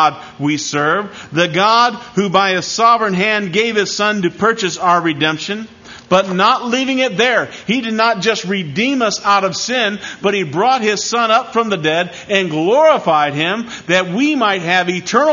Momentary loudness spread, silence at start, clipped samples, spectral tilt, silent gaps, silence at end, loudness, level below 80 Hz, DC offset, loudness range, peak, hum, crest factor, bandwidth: 7 LU; 0 s; under 0.1%; -4 dB/octave; none; 0 s; -15 LUFS; -58 dBFS; under 0.1%; 2 LU; 0 dBFS; none; 14 dB; 7.4 kHz